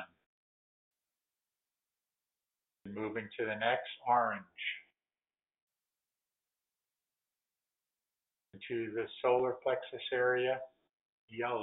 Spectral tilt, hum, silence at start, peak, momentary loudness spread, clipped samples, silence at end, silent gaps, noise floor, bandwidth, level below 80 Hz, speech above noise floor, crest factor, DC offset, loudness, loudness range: -2 dB/octave; none; 0 s; -18 dBFS; 17 LU; under 0.1%; 0 s; 0.26-0.91 s, 5.62-5.68 s, 10.93-11.28 s; under -90 dBFS; 4 kHz; -82 dBFS; over 55 dB; 22 dB; under 0.1%; -35 LUFS; 13 LU